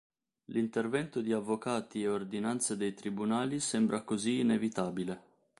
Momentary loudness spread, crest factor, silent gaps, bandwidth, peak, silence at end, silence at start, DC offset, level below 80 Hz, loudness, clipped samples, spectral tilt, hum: 6 LU; 16 dB; none; 11.5 kHz; -18 dBFS; 0.4 s; 0.5 s; under 0.1%; -72 dBFS; -33 LUFS; under 0.1%; -4.5 dB/octave; none